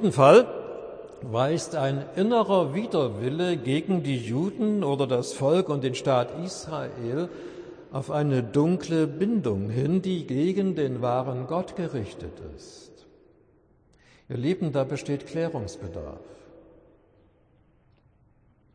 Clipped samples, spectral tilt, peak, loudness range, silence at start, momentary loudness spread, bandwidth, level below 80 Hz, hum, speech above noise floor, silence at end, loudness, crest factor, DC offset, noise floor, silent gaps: under 0.1%; -6.5 dB/octave; -4 dBFS; 8 LU; 0 s; 15 LU; 10.5 kHz; -58 dBFS; none; 36 dB; 2.15 s; -26 LUFS; 22 dB; under 0.1%; -62 dBFS; none